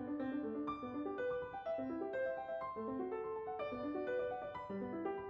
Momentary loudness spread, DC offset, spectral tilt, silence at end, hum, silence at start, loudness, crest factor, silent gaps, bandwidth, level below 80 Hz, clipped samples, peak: 3 LU; under 0.1%; -5 dB/octave; 0 s; none; 0 s; -42 LUFS; 12 dB; none; 6.4 kHz; -70 dBFS; under 0.1%; -30 dBFS